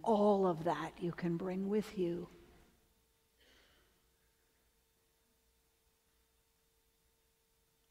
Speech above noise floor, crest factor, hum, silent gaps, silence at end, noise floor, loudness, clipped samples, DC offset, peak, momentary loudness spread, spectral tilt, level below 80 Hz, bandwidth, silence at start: 41 dB; 20 dB; none; none; 5.55 s; -76 dBFS; -36 LUFS; under 0.1%; under 0.1%; -22 dBFS; 11 LU; -7.5 dB/octave; -72 dBFS; 16 kHz; 0 s